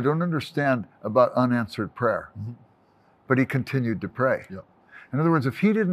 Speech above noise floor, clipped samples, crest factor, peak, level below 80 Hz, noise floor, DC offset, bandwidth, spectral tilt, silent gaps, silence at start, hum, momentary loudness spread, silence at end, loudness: 36 dB; under 0.1%; 20 dB; -6 dBFS; -64 dBFS; -60 dBFS; under 0.1%; 14.5 kHz; -8.5 dB/octave; none; 0 s; none; 12 LU; 0 s; -24 LUFS